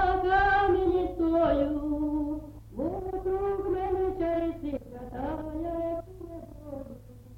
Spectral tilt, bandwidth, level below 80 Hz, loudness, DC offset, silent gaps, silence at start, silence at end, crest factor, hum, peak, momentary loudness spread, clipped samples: -8 dB/octave; 16 kHz; -42 dBFS; -29 LUFS; under 0.1%; none; 0 s; 0 s; 16 dB; none; -14 dBFS; 18 LU; under 0.1%